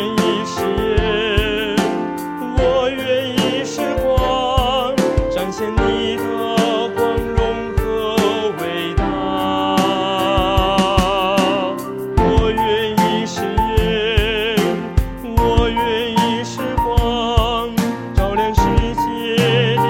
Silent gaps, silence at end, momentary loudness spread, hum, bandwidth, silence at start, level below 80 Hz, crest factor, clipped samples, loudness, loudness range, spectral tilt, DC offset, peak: none; 0 s; 5 LU; none; 17 kHz; 0 s; -26 dBFS; 16 dB; under 0.1%; -18 LUFS; 2 LU; -5.5 dB/octave; under 0.1%; 0 dBFS